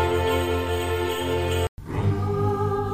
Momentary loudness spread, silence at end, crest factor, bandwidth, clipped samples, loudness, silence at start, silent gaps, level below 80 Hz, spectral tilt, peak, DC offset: 3 LU; 0 s; 14 dB; 15.5 kHz; under 0.1%; -25 LUFS; 0 s; 1.69-1.77 s; -38 dBFS; -6 dB/octave; -10 dBFS; 0.6%